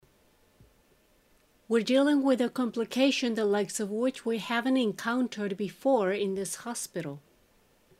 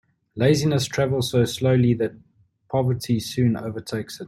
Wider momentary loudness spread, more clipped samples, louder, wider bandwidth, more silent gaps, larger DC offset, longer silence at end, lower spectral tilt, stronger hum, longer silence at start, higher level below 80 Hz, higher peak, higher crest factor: about the same, 10 LU vs 10 LU; neither; second, -28 LUFS vs -22 LUFS; about the same, 15 kHz vs 14 kHz; neither; neither; first, 0.8 s vs 0 s; second, -4 dB/octave vs -6 dB/octave; neither; first, 1.7 s vs 0.35 s; second, -72 dBFS vs -54 dBFS; second, -12 dBFS vs -6 dBFS; about the same, 18 dB vs 16 dB